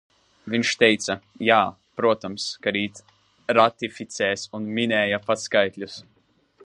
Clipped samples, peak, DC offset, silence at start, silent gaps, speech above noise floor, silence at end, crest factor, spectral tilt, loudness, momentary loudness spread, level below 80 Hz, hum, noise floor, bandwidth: under 0.1%; -2 dBFS; under 0.1%; 0.45 s; none; 35 dB; 0.65 s; 22 dB; -3.5 dB/octave; -23 LUFS; 13 LU; -64 dBFS; none; -58 dBFS; 11 kHz